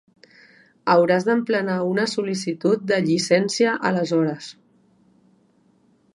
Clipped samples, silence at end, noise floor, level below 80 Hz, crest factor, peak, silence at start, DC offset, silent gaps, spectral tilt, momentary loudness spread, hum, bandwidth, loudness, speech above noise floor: under 0.1%; 1.65 s; -60 dBFS; -70 dBFS; 20 dB; -4 dBFS; 0.85 s; under 0.1%; none; -5 dB/octave; 8 LU; none; 11.5 kHz; -21 LUFS; 40 dB